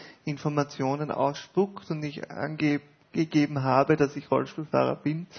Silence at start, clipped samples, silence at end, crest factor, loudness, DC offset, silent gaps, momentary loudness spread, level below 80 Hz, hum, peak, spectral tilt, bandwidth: 0 s; under 0.1%; 0 s; 20 dB; -28 LUFS; under 0.1%; none; 10 LU; -66 dBFS; none; -6 dBFS; -7 dB/octave; 6.6 kHz